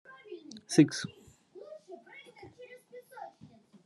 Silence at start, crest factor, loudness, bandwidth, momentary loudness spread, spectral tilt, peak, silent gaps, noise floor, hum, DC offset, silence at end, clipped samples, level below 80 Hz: 0.3 s; 26 dB; -28 LUFS; 12 kHz; 26 LU; -5.5 dB/octave; -10 dBFS; none; -58 dBFS; none; under 0.1%; 0.55 s; under 0.1%; -80 dBFS